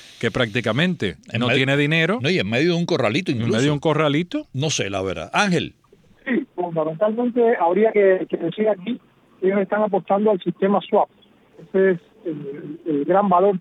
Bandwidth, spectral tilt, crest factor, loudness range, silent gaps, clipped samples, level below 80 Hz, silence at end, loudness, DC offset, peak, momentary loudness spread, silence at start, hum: 11 kHz; -5.5 dB/octave; 16 dB; 3 LU; none; under 0.1%; -58 dBFS; 0 s; -20 LUFS; under 0.1%; -4 dBFS; 9 LU; 0.05 s; none